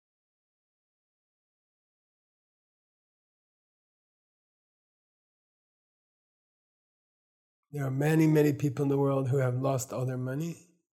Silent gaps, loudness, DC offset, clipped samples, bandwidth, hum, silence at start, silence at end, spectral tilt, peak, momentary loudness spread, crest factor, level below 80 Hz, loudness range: none; -28 LUFS; under 0.1%; under 0.1%; 16 kHz; none; 7.75 s; 0.4 s; -7.5 dB/octave; -12 dBFS; 12 LU; 20 dB; -76 dBFS; 7 LU